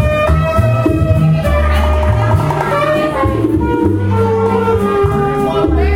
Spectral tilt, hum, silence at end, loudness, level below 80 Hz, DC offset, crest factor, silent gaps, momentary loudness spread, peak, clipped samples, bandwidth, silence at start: -8 dB/octave; none; 0 s; -13 LUFS; -22 dBFS; under 0.1%; 12 dB; none; 2 LU; 0 dBFS; under 0.1%; 16 kHz; 0 s